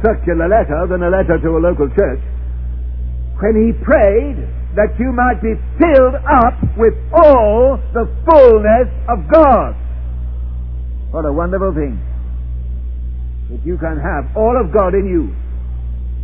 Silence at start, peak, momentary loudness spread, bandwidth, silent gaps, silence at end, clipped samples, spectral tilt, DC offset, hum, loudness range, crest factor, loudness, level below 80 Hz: 0 s; 0 dBFS; 16 LU; 4.4 kHz; none; 0 s; 0.3%; -11 dB/octave; 1%; none; 10 LU; 14 dB; -13 LUFS; -20 dBFS